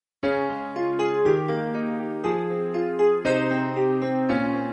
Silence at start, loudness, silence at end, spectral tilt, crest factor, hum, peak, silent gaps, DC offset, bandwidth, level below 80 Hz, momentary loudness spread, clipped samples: 0.25 s; -24 LUFS; 0 s; -7 dB/octave; 14 dB; none; -10 dBFS; none; under 0.1%; 8.8 kHz; -60 dBFS; 6 LU; under 0.1%